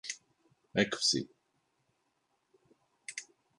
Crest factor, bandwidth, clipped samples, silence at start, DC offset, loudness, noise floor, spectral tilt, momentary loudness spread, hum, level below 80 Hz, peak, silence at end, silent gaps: 26 dB; 11.5 kHz; under 0.1%; 0.05 s; under 0.1%; -32 LUFS; -79 dBFS; -2.5 dB/octave; 19 LU; none; -74 dBFS; -12 dBFS; 0.35 s; none